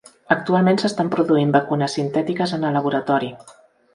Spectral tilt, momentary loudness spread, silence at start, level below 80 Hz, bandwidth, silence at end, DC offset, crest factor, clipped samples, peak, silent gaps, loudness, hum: -6.5 dB/octave; 5 LU; 0.3 s; -62 dBFS; 11 kHz; 0.45 s; under 0.1%; 20 dB; under 0.1%; 0 dBFS; none; -20 LUFS; none